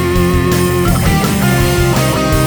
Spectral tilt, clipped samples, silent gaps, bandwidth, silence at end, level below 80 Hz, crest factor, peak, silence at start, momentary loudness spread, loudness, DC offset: -5.5 dB/octave; under 0.1%; none; over 20 kHz; 0 s; -22 dBFS; 12 dB; 0 dBFS; 0 s; 1 LU; -12 LUFS; under 0.1%